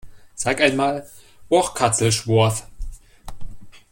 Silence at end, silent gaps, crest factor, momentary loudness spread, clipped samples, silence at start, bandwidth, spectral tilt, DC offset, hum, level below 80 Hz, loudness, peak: 0.15 s; none; 20 dB; 22 LU; under 0.1%; 0.05 s; 16.5 kHz; -4 dB/octave; under 0.1%; none; -40 dBFS; -20 LUFS; -2 dBFS